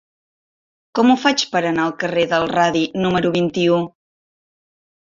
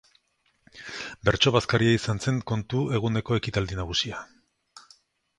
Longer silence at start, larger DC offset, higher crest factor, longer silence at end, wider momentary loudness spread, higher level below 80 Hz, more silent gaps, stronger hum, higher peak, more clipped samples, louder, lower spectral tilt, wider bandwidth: first, 0.95 s vs 0.75 s; neither; second, 18 dB vs 24 dB; first, 1.15 s vs 0.6 s; second, 5 LU vs 15 LU; second, -56 dBFS vs -48 dBFS; neither; neither; about the same, -2 dBFS vs -4 dBFS; neither; first, -18 LUFS vs -25 LUFS; about the same, -5 dB/octave vs -5 dB/octave; second, 7.6 kHz vs 11 kHz